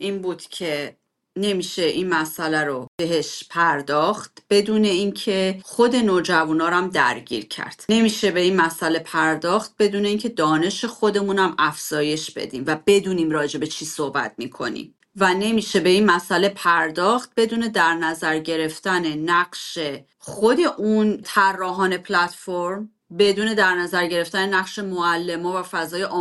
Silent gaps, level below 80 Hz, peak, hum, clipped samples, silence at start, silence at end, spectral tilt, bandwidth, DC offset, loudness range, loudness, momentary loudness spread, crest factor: 2.88-2.98 s; -62 dBFS; -4 dBFS; none; under 0.1%; 0 s; 0 s; -4 dB/octave; 12.5 kHz; under 0.1%; 3 LU; -21 LUFS; 10 LU; 18 dB